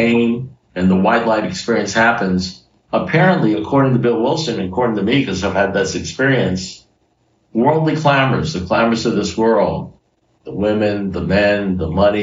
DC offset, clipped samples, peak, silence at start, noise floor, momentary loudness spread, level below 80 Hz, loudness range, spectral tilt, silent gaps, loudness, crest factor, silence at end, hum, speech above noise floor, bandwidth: under 0.1%; under 0.1%; -2 dBFS; 0 s; -60 dBFS; 7 LU; -44 dBFS; 2 LU; -6 dB/octave; none; -16 LUFS; 14 dB; 0 s; none; 45 dB; 7.6 kHz